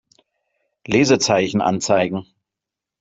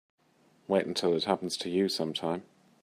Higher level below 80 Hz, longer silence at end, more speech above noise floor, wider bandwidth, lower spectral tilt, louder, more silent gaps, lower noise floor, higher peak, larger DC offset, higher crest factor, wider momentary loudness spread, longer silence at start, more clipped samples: first, -58 dBFS vs -76 dBFS; first, 0.8 s vs 0.4 s; first, 68 dB vs 36 dB; second, 8.2 kHz vs 15.5 kHz; about the same, -4.5 dB/octave vs -4.5 dB/octave; first, -18 LUFS vs -30 LUFS; neither; first, -86 dBFS vs -66 dBFS; first, -2 dBFS vs -10 dBFS; neither; about the same, 18 dB vs 20 dB; about the same, 7 LU vs 6 LU; first, 0.9 s vs 0.7 s; neither